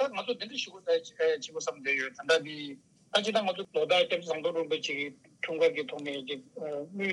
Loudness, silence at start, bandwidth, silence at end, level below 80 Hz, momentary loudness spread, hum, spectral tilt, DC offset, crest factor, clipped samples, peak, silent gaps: -31 LUFS; 0 s; 11.5 kHz; 0 s; -86 dBFS; 11 LU; none; -3 dB/octave; under 0.1%; 20 dB; under 0.1%; -12 dBFS; none